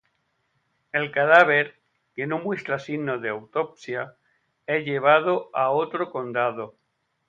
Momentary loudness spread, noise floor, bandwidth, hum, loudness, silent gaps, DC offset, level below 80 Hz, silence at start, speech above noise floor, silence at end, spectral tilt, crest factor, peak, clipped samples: 16 LU; -72 dBFS; 7.8 kHz; none; -23 LUFS; none; under 0.1%; -74 dBFS; 0.95 s; 49 dB; 0.6 s; -6.5 dB/octave; 22 dB; -2 dBFS; under 0.1%